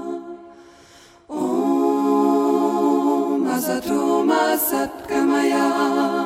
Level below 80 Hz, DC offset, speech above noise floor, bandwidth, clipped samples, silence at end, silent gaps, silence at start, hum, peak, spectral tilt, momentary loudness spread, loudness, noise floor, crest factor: -60 dBFS; under 0.1%; 29 dB; 16.5 kHz; under 0.1%; 0 s; none; 0 s; none; -6 dBFS; -4.5 dB/octave; 8 LU; -19 LUFS; -48 dBFS; 14 dB